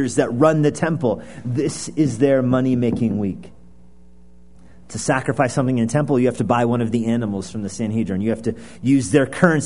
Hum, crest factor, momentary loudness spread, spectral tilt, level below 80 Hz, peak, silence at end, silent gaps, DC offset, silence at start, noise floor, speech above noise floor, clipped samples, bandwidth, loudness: none; 20 dB; 10 LU; -6.5 dB/octave; -50 dBFS; 0 dBFS; 0 s; none; 0.7%; 0 s; -49 dBFS; 31 dB; under 0.1%; 11 kHz; -20 LUFS